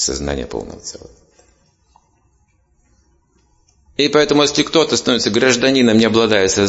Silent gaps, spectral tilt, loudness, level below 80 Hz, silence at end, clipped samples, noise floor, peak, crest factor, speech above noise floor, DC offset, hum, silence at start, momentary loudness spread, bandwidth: none; -3.5 dB/octave; -14 LUFS; -42 dBFS; 0 s; under 0.1%; -59 dBFS; 0 dBFS; 16 dB; 44 dB; under 0.1%; none; 0 s; 16 LU; 8 kHz